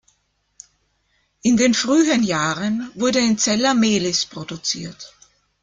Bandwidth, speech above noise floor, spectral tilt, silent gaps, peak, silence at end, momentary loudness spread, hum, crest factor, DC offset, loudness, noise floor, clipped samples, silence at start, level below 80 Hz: 9.6 kHz; 48 dB; -3.5 dB/octave; none; -4 dBFS; 0.55 s; 11 LU; 50 Hz at -60 dBFS; 16 dB; under 0.1%; -19 LUFS; -67 dBFS; under 0.1%; 1.45 s; -56 dBFS